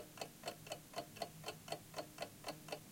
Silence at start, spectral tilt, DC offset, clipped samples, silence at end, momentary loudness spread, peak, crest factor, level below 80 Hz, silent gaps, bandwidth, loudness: 0 s; -3 dB/octave; under 0.1%; under 0.1%; 0 s; 3 LU; -28 dBFS; 22 dB; -74 dBFS; none; 17 kHz; -49 LUFS